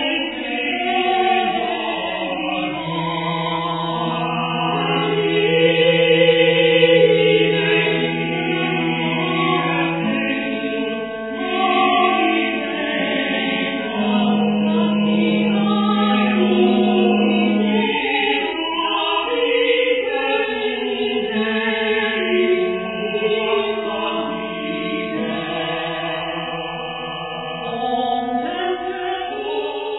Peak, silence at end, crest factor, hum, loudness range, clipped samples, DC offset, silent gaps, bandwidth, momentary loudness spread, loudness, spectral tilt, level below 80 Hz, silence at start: -2 dBFS; 0 s; 16 dB; none; 9 LU; under 0.1%; 0.1%; none; 4.1 kHz; 9 LU; -19 LUFS; -9 dB/octave; -56 dBFS; 0 s